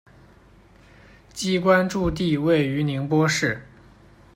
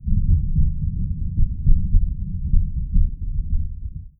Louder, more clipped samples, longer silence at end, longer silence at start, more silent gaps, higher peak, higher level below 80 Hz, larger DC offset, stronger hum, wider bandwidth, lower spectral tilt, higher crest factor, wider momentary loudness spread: about the same, -22 LUFS vs -24 LUFS; neither; first, 0.7 s vs 0.1 s; first, 1.35 s vs 0 s; neither; about the same, -4 dBFS vs -2 dBFS; second, -46 dBFS vs -20 dBFS; neither; neither; first, 16 kHz vs 0.5 kHz; second, -5.5 dB/octave vs -16 dB/octave; about the same, 20 dB vs 16 dB; about the same, 9 LU vs 7 LU